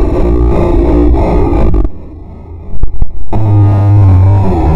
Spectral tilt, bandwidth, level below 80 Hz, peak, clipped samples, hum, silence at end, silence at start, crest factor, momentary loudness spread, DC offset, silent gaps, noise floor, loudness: -10.5 dB/octave; 4.3 kHz; -12 dBFS; 0 dBFS; 2%; none; 0 s; 0 s; 6 dB; 22 LU; under 0.1%; none; -26 dBFS; -10 LUFS